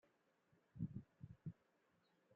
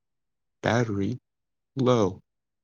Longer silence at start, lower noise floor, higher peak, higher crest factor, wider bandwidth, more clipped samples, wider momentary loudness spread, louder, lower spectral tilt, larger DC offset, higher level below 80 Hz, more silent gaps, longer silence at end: about the same, 0.75 s vs 0.65 s; second, -81 dBFS vs -89 dBFS; second, -34 dBFS vs -6 dBFS; about the same, 22 dB vs 22 dB; second, 4.5 kHz vs 7.2 kHz; neither; about the same, 15 LU vs 13 LU; second, -55 LUFS vs -26 LUFS; first, -10.5 dB/octave vs -6.5 dB/octave; neither; second, -76 dBFS vs -68 dBFS; neither; second, 0 s vs 0.45 s